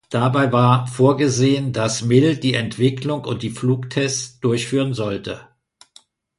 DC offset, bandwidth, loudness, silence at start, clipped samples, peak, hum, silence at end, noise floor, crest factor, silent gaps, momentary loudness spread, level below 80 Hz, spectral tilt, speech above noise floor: under 0.1%; 11.5 kHz; -19 LUFS; 0.1 s; under 0.1%; -2 dBFS; none; 0.95 s; -53 dBFS; 18 dB; none; 9 LU; -54 dBFS; -5.5 dB/octave; 35 dB